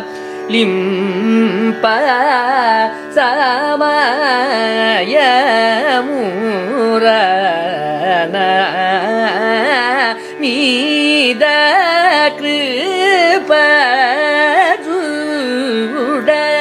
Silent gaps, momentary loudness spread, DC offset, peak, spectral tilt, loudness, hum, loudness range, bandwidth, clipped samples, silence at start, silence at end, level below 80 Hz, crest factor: none; 7 LU; under 0.1%; 0 dBFS; -4 dB/octave; -12 LUFS; none; 3 LU; 15 kHz; under 0.1%; 0 s; 0 s; -66 dBFS; 12 dB